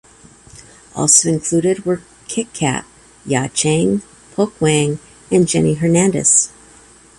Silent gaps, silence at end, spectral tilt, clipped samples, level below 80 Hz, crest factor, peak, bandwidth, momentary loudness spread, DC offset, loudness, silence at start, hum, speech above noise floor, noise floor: none; 0.7 s; -4 dB/octave; under 0.1%; -50 dBFS; 18 dB; 0 dBFS; 12 kHz; 13 LU; under 0.1%; -16 LUFS; 0.95 s; none; 30 dB; -45 dBFS